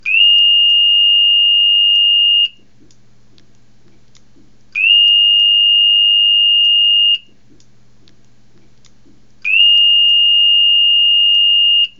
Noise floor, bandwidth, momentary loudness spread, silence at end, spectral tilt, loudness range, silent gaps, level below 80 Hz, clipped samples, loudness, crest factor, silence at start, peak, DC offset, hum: -52 dBFS; 6.6 kHz; 4 LU; 0.1 s; 1.5 dB/octave; 5 LU; none; -62 dBFS; under 0.1%; -8 LUFS; 12 dB; 0.05 s; -2 dBFS; 0.7%; none